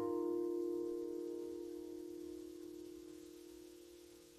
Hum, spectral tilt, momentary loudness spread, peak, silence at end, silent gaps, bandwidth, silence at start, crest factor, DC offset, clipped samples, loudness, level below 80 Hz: none; -6 dB/octave; 17 LU; -30 dBFS; 0 s; none; 13.5 kHz; 0 s; 14 dB; under 0.1%; under 0.1%; -45 LUFS; -76 dBFS